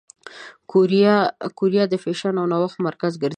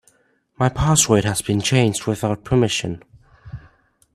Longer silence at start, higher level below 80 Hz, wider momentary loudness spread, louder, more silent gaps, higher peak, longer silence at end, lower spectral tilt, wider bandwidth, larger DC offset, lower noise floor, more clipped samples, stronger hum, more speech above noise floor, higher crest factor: second, 0.25 s vs 0.6 s; second, -70 dBFS vs -40 dBFS; second, 11 LU vs 24 LU; about the same, -20 LUFS vs -19 LUFS; neither; about the same, -4 dBFS vs -2 dBFS; second, 0 s vs 0.55 s; first, -7 dB/octave vs -4.5 dB/octave; second, 9.4 kHz vs 14 kHz; neither; second, -41 dBFS vs -61 dBFS; neither; neither; second, 22 dB vs 42 dB; about the same, 18 dB vs 20 dB